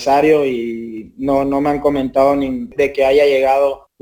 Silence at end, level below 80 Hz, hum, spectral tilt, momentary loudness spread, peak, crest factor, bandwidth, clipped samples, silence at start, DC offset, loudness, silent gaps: 0.25 s; -44 dBFS; none; -6 dB/octave; 11 LU; -2 dBFS; 14 dB; over 20 kHz; under 0.1%; 0 s; under 0.1%; -15 LUFS; none